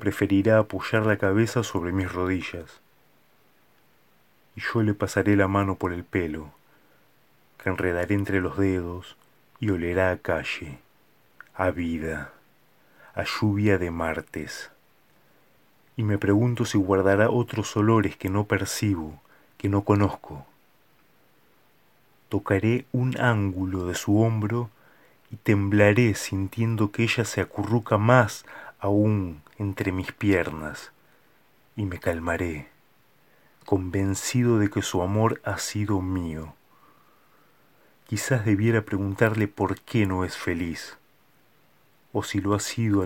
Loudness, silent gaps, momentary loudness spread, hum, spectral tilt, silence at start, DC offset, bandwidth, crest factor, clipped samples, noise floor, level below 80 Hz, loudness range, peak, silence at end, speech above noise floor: -25 LUFS; none; 14 LU; none; -6 dB/octave; 0 s; under 0.1%; 17 kHz; 24 dB; under 0.1%; -63 dBFS; -52 dBFS; 6 LU; -2 dBFS; 0 s; 39 dB